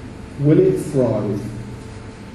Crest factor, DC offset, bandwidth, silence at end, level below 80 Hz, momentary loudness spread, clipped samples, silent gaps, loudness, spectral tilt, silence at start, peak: 18 dB; under 0.1%; 12.5 kHz; 0 s; -42 dBFS; 20 LU; under 0.1%; none; -18 LUFS; -8.5 dB/octave; 0 s; -2 dBFS